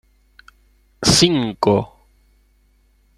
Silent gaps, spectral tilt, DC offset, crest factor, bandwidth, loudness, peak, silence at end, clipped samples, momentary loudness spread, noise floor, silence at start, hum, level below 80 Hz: none; -4 dB/octave; under 0.1%; 20 dB; 15.5 kHz; -16 LUFS; -2 dBFS; 1.3 s; under 0.1%; 8 LU; -57 dBFS; 1 s; 50 Hz at -40 dBFS; -44 dBFS